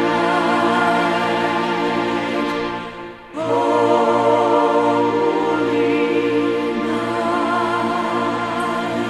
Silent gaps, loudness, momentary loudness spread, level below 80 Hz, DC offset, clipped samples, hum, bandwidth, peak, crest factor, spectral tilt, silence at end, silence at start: none; -18 LUFS; 6 LU; -54 dBFS; under 0.1%; under 0.1%; none; 13 kHz; -2 dBFS; 16 dB; -5.5 dB/octave; 0 s; 0 s